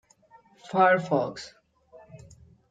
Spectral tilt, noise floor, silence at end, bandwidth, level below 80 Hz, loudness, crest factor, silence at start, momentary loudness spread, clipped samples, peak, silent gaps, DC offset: -6 dB/octave; -58 dBFS; 0.55 s; 9 kHz; -66 dBFS; -24 LUFS; 22 dB; 0.7 s; 21 LU; under 0.1%; -8 dBFS; none; under 0.1%